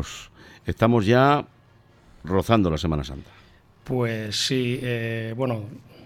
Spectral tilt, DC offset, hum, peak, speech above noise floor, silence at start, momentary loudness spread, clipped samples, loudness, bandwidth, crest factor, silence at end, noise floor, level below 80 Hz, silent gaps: -6 dB/octave; under 0.1%; none; -2 dBFS; 32 dB; 0 s; 19 LU; under 0.1%; -23 LUFS; 15.5 kHz; 22 dB; 0 s; -55 dBFS; -44 dBFS; none